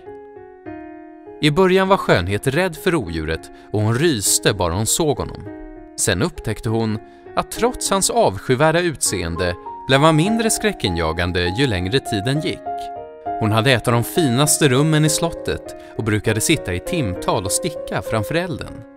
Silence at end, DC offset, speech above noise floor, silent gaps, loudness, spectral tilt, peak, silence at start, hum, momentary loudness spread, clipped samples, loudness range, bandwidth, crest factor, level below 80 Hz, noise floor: 0.05 s; under 0.1%; 21 dB; none; -19 LUFS; -4 dB/octave; 0 dBFS; 0.05 s; none; 15 LU; under 0.1%; 4 LU; 16 kHz; 20 dB; -40 dBFS; -39 dBFS